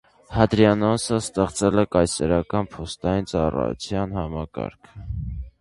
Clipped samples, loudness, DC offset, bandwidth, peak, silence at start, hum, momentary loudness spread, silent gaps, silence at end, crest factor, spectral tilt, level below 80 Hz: under 0.1%; -23 LUFS; under 0.1%; 11.5 kHz; 0 dBFS; 0.3 s; none; 15 LU; none; 0.1 s; 22 dB; -6 dB/octave; -38 dBFS